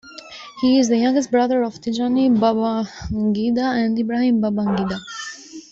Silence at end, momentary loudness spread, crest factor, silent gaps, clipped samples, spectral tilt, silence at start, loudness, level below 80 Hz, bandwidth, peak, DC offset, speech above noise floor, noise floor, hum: 0.1 s; 15 LU; 14 dB; none; under 0.1%; -5.5 dB/octave; 0.05 s; -19 LUFS; -48 dBFS; 7.8 kHz; -4 dBFS; under 0.1%; 20 dB; -39 dBFS; none